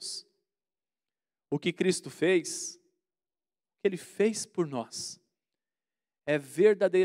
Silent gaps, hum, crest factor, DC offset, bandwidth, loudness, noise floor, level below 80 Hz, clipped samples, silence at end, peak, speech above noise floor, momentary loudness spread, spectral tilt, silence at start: none; none; 20 dB; under 0.1%; 15.5 kHz; -30 LUFS; under -90 dBFS; -82 dBFS; under 0.1%; 0 s; -10 dBFS; over 62 dB; 15 LU; -4.5 dB/octave; 0 s